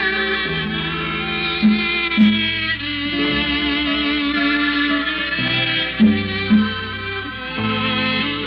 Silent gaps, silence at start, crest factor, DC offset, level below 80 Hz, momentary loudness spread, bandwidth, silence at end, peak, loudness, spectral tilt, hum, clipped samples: none; 0 s; 16 dB; under 0.1%; -40 dBFS; 6 LU; 5.6 kHz; 0 s; -4 dBFS; -18 LUFS; -7.5 dB/octave; none; under 0.1%